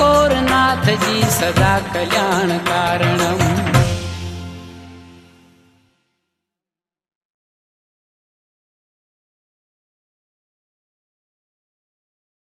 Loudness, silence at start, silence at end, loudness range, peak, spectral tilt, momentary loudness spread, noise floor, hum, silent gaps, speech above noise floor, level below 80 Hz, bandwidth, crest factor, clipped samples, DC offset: -16 LUFS; 0 s; 7.35 s; 15 LU; 0 dBFS; -4.5 dB/octave; 15 LU; -90 dBFS; none; none; 74 dB; -40 dBFS; 14.5 kHz; 20 dB; under 0.1%; under 0.1%